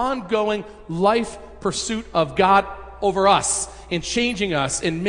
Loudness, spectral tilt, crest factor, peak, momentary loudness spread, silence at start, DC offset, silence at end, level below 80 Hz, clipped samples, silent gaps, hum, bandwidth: -21 LUFS; -3.5 dB/octave; 18 dB; -4 dBFS; 11 LU; 0 s; under 0.1%; 0 s; -44 dBFS; under 0.1%; none; none; 10.5 kHz